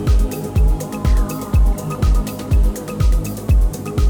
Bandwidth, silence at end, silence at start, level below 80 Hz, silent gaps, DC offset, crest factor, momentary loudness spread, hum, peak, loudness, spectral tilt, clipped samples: 18.5 kHz; 0 s; 0 s; -16 dBFS; none; under 0.1%; 10 dB; 3 LU; none; -6 dBFS; -19 LUFS; -7 dB/octave; under 0.1%